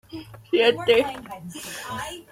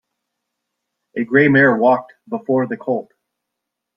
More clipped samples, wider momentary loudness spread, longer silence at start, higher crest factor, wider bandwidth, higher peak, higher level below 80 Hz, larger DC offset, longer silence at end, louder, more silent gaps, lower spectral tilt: neither; first, 18 LU vs 15 LU; second, 0.1 s vs 1.15 s; about the same, 20 dB vs 18 dB; first, 16 kHz vs 5.6 kHz; about the same, -4 dBFS vs -2 dBFS; first, -56 dBFS vs -62 dBFS; neither; second, 0.1 s vs 0.95 s; second, -23 LUFS vs -16 LUFS; neither; second, -3.5 dB/octave vs -9.5 dB/octave